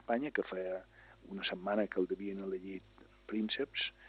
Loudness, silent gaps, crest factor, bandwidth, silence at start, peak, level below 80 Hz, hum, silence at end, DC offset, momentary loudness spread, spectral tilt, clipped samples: -38 LUFS; none; 18 dB; 5.8 kHz; 0.1 s; -20 dBFS; -68 dBFS; 50 Hz at -70 dBFS; 0 s; under 0.1%; 13 LU; -7.5 dB/octave; under 0.1%